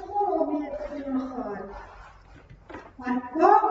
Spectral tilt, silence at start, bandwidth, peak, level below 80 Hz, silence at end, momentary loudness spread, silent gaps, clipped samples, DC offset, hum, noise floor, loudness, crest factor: -7 dB/octave; 0 s; 7.4 kHz; -6 dBFS; -54 dBFS; 0 s; 23 LU; none; under 0.1%; under 0.1%; none; -50 dBFS; -27 LUFS; 20 dB